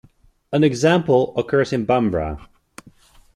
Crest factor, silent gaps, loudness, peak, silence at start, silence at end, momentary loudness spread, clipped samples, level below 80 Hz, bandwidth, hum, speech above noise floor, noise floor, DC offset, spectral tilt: 16 dB; none; -19 LUFS; -4 dBFS; 0.5 s; 0.9 s; 9 LU; under 0.1%; -44 dBFS; 12.5 kHz; none; 32 dB; -50 dBFS; under 0.1%; -6.5 dB/octave